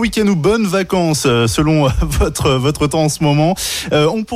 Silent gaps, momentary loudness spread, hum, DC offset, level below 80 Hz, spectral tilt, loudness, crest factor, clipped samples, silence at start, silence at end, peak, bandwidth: none; 2 LU; none; under 0.1%; -26 dBFS; -5 dB/octave; -14 LUFS; 12 dB; under 0.1%; 0 s; 0 s; -2 dBFS; 16 kHz